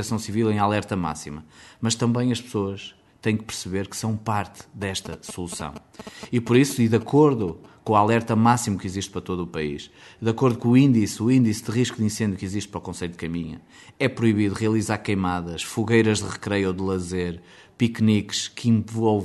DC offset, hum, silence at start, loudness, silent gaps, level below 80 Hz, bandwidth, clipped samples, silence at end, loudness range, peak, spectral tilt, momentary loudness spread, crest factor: under 0.1%; none; 0 s; -23 LUFS; none; -54 dBFS; 12 kHz; under 0.1%; 0 s; 6 LU; -4 dBFS; -5.5 dB/octave; 14 LU; 18 dB